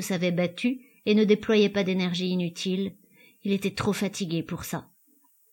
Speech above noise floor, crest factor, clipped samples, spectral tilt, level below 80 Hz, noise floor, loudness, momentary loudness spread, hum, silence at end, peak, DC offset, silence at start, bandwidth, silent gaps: 37 dB; 18 dB; under 0.1%; -5.5 dB/octave; -62 dBFS; -63 dBFS; -27 LUFS; 12 LU; none; 0.7 s; -8 dBFS; under 0.1%; 0 s; 17 kHz; none